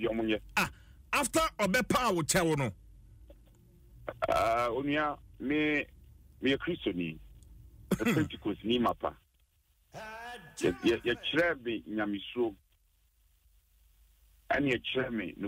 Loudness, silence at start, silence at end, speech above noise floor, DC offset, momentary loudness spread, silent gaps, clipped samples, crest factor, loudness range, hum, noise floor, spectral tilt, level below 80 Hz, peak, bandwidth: -31 LUFS; 0 s; 0 s; 39 dB; under 0.1%; 12 LU; none; under 0.1%; 16 dB; 5 LU; none; -70 dBFS; -4.5 dB/octave; -56 dBFS; -16 dBFS; 16 kHz